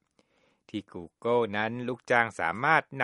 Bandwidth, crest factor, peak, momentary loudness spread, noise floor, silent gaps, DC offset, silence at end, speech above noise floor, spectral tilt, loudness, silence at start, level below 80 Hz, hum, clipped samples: 11.5 kHz; 22 dB; -6 dBFS; 15 LU; -69 dBFS; none; under 0.1%; 0 s; 40 dB; -5.5 dB/octave; -28 LUFS; 0.75 s; -70 dBFS; none; under 0.1%